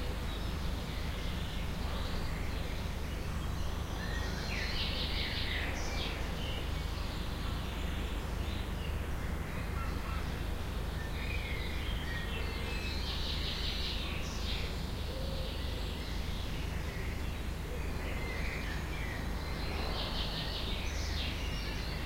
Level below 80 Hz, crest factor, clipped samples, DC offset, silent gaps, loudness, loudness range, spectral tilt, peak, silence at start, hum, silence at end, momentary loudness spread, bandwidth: -38 dBFS; 14 dB; under 0.1%; under 0.1%; none; -38 LUFS; 2 LU; -4.5 dB/octave; -22 dBFS; 0 s; none; 0 s; 4 LU; 16 kHz